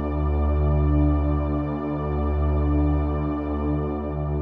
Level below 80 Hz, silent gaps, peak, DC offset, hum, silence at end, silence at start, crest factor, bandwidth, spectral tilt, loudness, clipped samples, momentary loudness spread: -26 dBFS; none; -10 dBFS; under 0.1%; none; 0 s; 0 s; 12 dB; 3.7 kHz; -12 dB/octave; -24 LUFS; under 0.1%; 6 LU